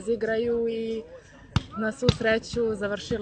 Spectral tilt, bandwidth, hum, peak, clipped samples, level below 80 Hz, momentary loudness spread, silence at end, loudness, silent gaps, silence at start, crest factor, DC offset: -6 dB/octave; 9 kHz; none; -4 dBFS; under 0.1%; -44 dBFS; 7 LU; 0 s; -27 LUFS; none; 0 s; 24 dB; under 0.1%